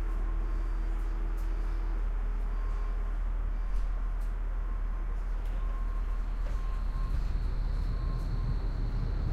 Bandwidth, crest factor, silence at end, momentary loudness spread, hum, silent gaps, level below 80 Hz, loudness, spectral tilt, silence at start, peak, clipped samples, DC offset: 4.8 kHz; 10 dB; 0 s; 2 LU; none; none; -30 dBFS; -36 LUFS; -7.5 dB/octave; 0 s; -20 dBFS; under 0.1%; under 0.1%